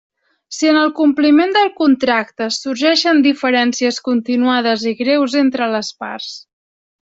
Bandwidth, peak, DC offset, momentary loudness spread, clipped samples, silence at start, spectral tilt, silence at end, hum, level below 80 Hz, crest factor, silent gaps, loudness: 7.8 kHz; -2 dBFS; under 0.1%; 13 LU; under 0.1%; 0.5 s; -3 dB/octave; 0.75 s; none; -62 dBFS; 12 dB; none; -15 LUFS